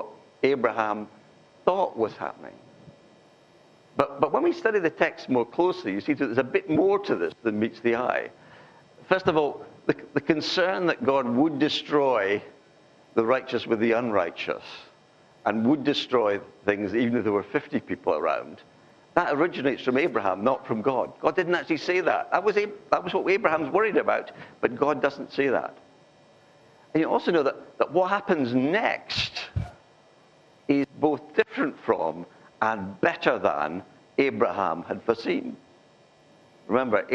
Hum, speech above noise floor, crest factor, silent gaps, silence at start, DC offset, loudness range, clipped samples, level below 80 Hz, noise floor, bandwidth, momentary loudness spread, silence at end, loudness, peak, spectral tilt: none; 32 dB; 24 dB; none; 0 s; under 0.1%; 4 LU; under 0.1%; -62 dBFS; -57 dBFS; 8 kHz; 8 LU; 0 s; -26 LUFS; -4 dBFS; -6 dB/octave